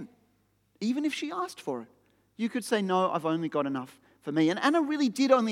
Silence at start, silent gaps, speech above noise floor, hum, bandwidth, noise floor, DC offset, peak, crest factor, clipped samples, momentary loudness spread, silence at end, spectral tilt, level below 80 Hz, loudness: 0 s; none; 42 dB; none; 15 kHz; -70 dBFS; under 0.1%; -10 dBFS; 20 dB; under 0.1%; 12 LU; 0 s; -5 dB/octave; -82 dBFS; -29 LUFS